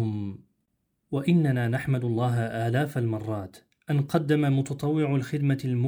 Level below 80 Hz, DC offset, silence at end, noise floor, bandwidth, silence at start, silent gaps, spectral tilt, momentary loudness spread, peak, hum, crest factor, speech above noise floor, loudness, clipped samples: -62 dBFS; under 0.1%; 0 s; -76 dBFS; over 20 kHz; 0 s; none; -8 dB/octave; 10 LU; -10 dBFS; none; 16 dB; 51 dB; -26 LUFS; under 0.1%